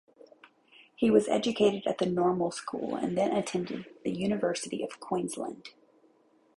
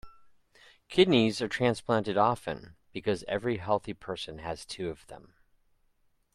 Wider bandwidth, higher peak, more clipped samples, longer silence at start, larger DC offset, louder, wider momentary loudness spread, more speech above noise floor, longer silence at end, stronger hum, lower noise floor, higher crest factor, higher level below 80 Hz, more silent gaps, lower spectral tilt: about the same, 11.5 kHz vs 12.5 kHz; about the same, -10 dBFS vs -10 dBFS; neither; first, 1 s vs 0.05 s; neither; about the same, -30 LUFS vs -29 LUFS; second, 12 LU vs 15 LU; second, 36 dB vs 40 dB; second, 0.9 s vs 1.2 s; neither; second, -65 dBFS vs -70 dBFS; about the same, 22 dB vs 22 dB; second, -66 dBFS vs -60 dBFS; neither; about the same, -5.5 dB/octave vs -5.5 dB/octave